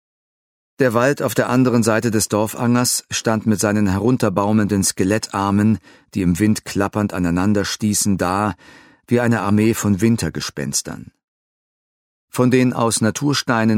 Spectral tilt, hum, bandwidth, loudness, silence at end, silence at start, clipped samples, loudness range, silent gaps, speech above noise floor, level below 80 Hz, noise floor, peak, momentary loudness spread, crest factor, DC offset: -5 dB/octave; none; 16.5 kHz; -18 LUFS; 0 s; 0.8 s; under 0.1%; 3 LU; 11.24-12.28 s; over 73 dB; -50 dBFS; under -90 dBFS; 0 dBFS; 6 LU; 18 dB; under 0.1%